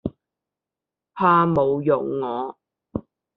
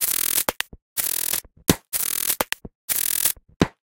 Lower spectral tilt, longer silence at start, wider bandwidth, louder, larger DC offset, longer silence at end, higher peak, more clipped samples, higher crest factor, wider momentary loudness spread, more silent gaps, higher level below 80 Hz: first, -6.5 dB/octave vs -2.5 dB/octave; about the same, 0.05 s vs 0 s; second, 5 kHz vs 18 kHz; about the same, -21 LUFS vs -22 LUFS; neither; first, 0.35 s vs 0.15 s; second, -4 dBFS vs 0 dBFS; neither; second, 18 dB vs 24 dB; first, 17 LU vs 7 LU; second, none vs 0.82-0.96 s, 2.75-2.88 s, 3.56-3.60 s; second, -56 dBFS vs -46 dBFS